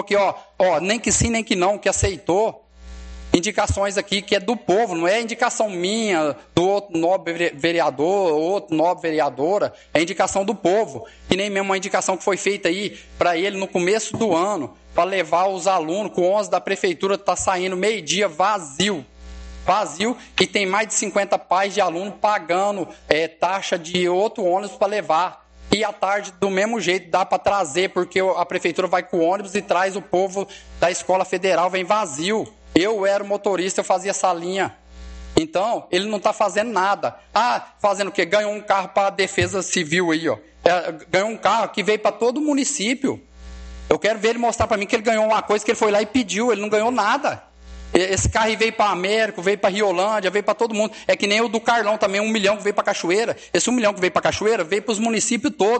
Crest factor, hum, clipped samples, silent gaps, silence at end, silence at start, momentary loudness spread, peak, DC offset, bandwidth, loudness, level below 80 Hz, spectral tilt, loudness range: 20 dB; none; under 0.1%; none; 0 s; 0 s; 4 LU; 0 dBFS; under 0.1%; 9 kHz; -20 LUFS; -44 dBFS; -3.5 dB/octave; 2 LU